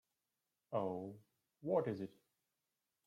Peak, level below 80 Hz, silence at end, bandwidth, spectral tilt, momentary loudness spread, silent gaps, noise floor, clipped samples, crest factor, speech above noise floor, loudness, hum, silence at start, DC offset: -24 dBFS; -88 dBFS; 0.95 s; 14 kHz; -9 dB/octave; 14 LU; none; under -90 dBFS; under 0.1%; 20 dB; over 50 dB; -42 LUFS; none; 0.7 s; under 0.1%